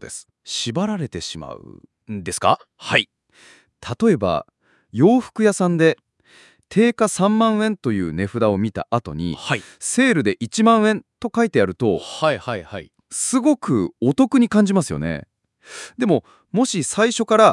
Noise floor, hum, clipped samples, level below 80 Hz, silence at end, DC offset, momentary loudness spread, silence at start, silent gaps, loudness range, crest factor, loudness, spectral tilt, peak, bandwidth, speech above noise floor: -52 dBFS; none; under 0.1%; -56 dBFS; 0 s; under 0.1%; 15 LU; 0 s; none; 3 LU; 20 dB; -19 LUFS; -5 dB/octave; 0 dBFS; 12 kHz; 33 dB